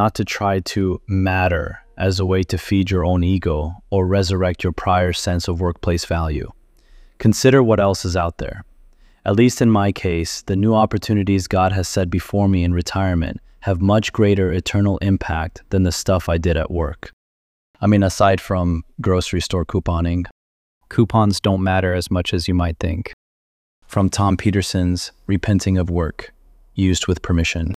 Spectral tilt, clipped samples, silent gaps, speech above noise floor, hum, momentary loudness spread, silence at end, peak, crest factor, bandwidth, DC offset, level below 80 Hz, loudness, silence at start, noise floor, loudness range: -6 dB/octave; under 0.1%; 17.13-17.74 s, 20.31-20.81 s, 23.13-23.82 s; 31 dB; none; 8 LU; 0 s; -2 dBFS; 18 dB; 14.5 kHz; under 0.1%; -34 dBFS; -19 LUFS; 0 s; -49 dBFS; 3 LU